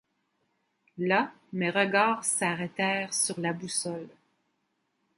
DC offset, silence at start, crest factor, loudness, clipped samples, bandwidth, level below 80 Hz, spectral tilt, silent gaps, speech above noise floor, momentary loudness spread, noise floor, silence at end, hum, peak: under 0.1%; 0.95 s; 22 dB; -28 LUFS; under 0.1%; 11.5 kHz; -78 dBFS; -3 dB/octave; none; 48 dB; 9 LU; -77 dBFS; 1.1 s; none; -10 dBFS